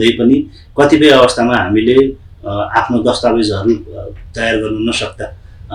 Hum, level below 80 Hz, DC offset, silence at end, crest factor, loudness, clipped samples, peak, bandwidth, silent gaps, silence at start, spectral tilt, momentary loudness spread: none; -36 dBFS; under 0.1%; 0 s; 12 dB; -12 LUFS; under 0.1%; 0 dBFS; 11.5 kHz; none; 0 s; -5 dB/octave; 18 LU